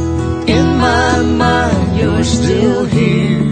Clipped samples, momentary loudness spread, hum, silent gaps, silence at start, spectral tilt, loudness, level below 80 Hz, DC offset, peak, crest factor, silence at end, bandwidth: under 0.1%; 2 LU; none; none; 0 s; -6 dB/octave; -12 LUFS; -26 dBFS; under 0.1%; 0 dBFS; 12 dB; 0 s; 9.8 kHz